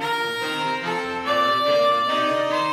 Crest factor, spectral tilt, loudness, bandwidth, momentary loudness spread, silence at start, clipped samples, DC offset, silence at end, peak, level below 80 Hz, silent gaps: 12 dB; -3.5 dB/octave; -21 LUFS; 15.5 kHz; 6 LU; 0 s; under 0.1%; under 0.1%; 0 s; -10 dBFS; -66 dBFS; none